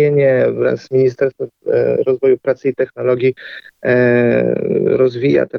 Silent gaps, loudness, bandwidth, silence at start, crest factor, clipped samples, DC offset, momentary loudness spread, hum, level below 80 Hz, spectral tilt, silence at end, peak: none; -15 LUFS; 6.4 kHz; 0 s; 12 dB; under 0.1%; under 0.1%; 7 LU; none; -56 dBFS; -9 dB/octave; 0 s; -2 dBFS